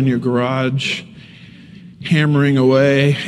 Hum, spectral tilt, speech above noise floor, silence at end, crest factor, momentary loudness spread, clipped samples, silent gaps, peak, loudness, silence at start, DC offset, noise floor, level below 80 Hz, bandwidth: none; -7 dB/octave; 25 dB; 0 s; 14 dB; 9 LU; under 0.1%; none; -2 dBFS; -15 LUFS; 0 s; under 0.1%; -40 dBFS; -56 dBFS; 10.5 kHz